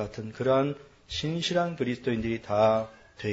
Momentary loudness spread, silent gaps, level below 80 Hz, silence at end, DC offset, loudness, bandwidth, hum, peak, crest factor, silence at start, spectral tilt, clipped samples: 12 LU; none; -54 dBFS; 0 s; under 0.1%; -28 LUFS; 8 kHz; none; -10 dBFS; 18 dB; 0 s; -6 dB/octave; under 0.1%